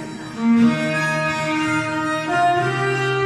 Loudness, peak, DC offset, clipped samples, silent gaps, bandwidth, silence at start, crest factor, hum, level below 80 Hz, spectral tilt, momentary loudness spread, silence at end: -19 LUFS; -6 dBFS; under 0.1%; under 0.1%; none; 12.5 kHz; 0 s; 14 dB; none; -56 dBFS; -5.5 dB/octave; 6 LU; 0 s